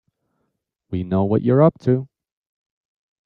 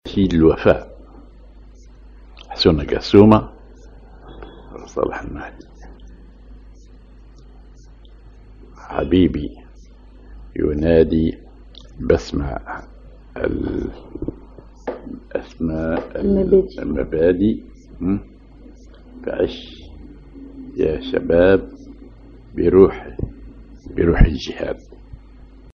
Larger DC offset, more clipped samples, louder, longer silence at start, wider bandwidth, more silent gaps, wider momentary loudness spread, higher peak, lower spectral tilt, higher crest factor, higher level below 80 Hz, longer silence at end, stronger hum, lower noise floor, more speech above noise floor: neither; neither; about the same, -19 LUFS vs -18 LUFS; first, 0.9 s vs 0.05 s; second, 5.6 kHz vs 7.2 kHz; neither; second, 12 LU vs 23 LU; second, -4 dBFS vs 0 dBFS; first, -11 dB/octave vs -8 dB/octave; about the same, 18 dB vs 20 dB; second, -56 dBFS vs -32 dBFS; first, 1.2 s vs 0.55 s; neither; first, -74 dBFS vs -43 dBFS; first, 57 dB vs 26 dB